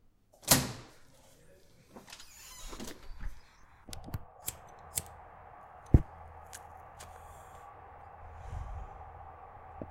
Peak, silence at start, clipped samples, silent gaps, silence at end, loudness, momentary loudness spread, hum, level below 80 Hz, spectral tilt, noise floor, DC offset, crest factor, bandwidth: -8 dBFS; 0.4 s; under 0.1%; none; 0 s; -34 LUFS; 23 LU; none; -44 dBFS; -3.5 dB/octave; -59 dBFS; under 0.1%; 30 dB; 16.5 kHz